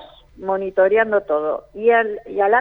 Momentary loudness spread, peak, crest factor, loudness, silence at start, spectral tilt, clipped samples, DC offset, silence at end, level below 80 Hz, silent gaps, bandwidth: 9 LU; -4 dBFS; 14 dB; -19 LUFS; 0 s; -7.5 dB/octave; under 0.1%; under 0.1%; 0 s; -54 dBFS; none; 4 kHz